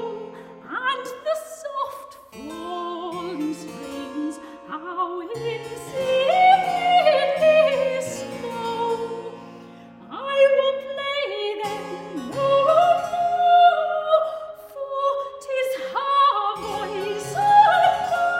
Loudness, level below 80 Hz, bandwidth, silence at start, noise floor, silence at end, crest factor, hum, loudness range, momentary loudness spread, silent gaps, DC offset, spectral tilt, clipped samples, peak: -21 LUFS; -62 dBFS; 16 kHz; 0 s; -43 dBFS; 0 s; 18 dB; none; 11 LU; 18 LU; none; under 0.1%; -4 dB/octave; under 0.1%; -4 dBFS